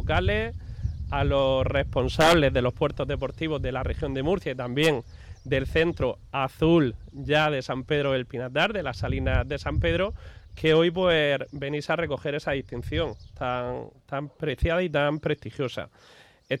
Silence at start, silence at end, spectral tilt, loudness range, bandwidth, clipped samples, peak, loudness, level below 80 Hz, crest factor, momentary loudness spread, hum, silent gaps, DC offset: 0 s; 0 s; -6 dB/octave; 5 LU; 16.5 kHz; under 0.1%; -10 dBFS; -26 LUFS; -38 dBFS; 16 dB; 12 LU; none; none; under 0.1%